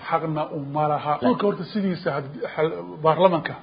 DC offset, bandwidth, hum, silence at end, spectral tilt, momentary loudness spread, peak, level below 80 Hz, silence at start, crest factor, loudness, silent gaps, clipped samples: under 0.1%; 5.2 kHz; none; 0 s; -11.5 dB/octave; 9 LU; -2 dBFS; -62 dBFS; 0 s; 20 dB; -23 LUFS; none; under 0.1%